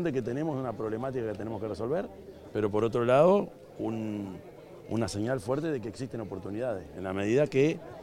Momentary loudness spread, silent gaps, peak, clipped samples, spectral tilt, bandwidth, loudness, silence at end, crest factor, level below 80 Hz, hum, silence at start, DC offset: 13 LU; none; -10 dBFS; under 0.1%; -7 dB/octave; 16 kHz; -30 LUFS; 0 s; 20 dB; -60 dBFS; none; 0 s; under 0.1%